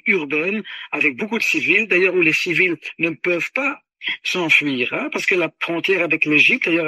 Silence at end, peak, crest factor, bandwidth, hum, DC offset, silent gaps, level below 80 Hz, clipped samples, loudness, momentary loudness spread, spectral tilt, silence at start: 0 s; -2 dBFS; 18 dB; 14.5 kHz; none; under 0.1%; none; -70 dBFS; under 0.1%; -17 LUFS; 9 LU; -4 dB/octave; 0.05 s